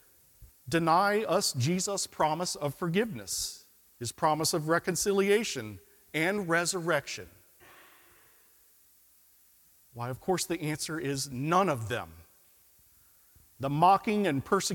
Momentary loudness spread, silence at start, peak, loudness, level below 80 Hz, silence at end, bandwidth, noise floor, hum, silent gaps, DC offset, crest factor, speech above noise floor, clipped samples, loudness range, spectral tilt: 14 LU; 0.4 s; -10 dBFS; -29 LUFS; -64 dBFS; 0 s; 18 kHz; -62 dBFS; none; none; under 0.1%; 20 dB; 33 dB; under 0.1%; 9 LU; -4 dB/octave